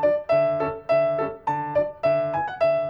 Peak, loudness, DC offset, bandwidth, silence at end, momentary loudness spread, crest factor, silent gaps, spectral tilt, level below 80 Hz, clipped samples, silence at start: -10 dBFS; -23 LUFS; under 0.1%; 5.8 kHz; 0 s; 5 LU; 12 dB; none; -8 dB/octave; -56 dBFS; under 0.1%; 0 s